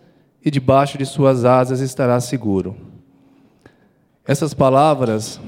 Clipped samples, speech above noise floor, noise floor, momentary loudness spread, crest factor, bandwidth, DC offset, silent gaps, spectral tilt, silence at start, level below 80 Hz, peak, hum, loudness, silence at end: under 0.1%; 41 dB; -57 dBFS; 10 LU; 18 dB; 16 kHz; under 0.1%; none; -6.5 dB/octave; 0.45 s; -52 dBFS; 0 dBFS; none; -17 LUFS; 0 s